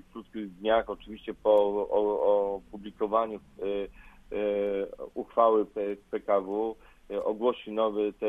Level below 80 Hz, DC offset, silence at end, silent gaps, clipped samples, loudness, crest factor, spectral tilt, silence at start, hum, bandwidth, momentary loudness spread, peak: -58 dBFS; under 0.1%; 0 s; none; under 0.1%; -29 LUFS; 20 dB; -7 dB/octave; 0.15 s; none; 3.9 kHz; 15 LU; -10 dBFS